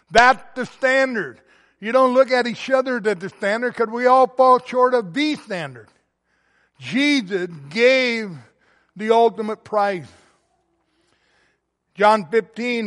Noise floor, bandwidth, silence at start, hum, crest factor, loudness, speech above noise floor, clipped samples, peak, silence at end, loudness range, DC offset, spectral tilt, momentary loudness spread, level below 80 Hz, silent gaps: -68 dBFS; 11.5 kHz; 0.1 s; none; 18 dB; -19 LUFS; 50 dB; under 0.1%; -2 dBFS; 0 s; 6 LU; under 0.1%; -4.5 dB/octave; 14 LU; -56 dBFS; none